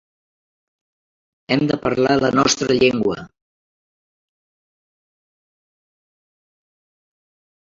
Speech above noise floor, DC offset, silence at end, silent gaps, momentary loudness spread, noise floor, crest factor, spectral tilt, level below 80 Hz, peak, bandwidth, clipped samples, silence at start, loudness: over 73 dB; under 0.1%; 4.45 s; none; 7 LU; under -90 dBFS; 22 dB; -4.5 dB/octave; -54 dBFS; -2 dBFS; 7.6 kHz; under 0.1%; 1.5 s; -18 LUFS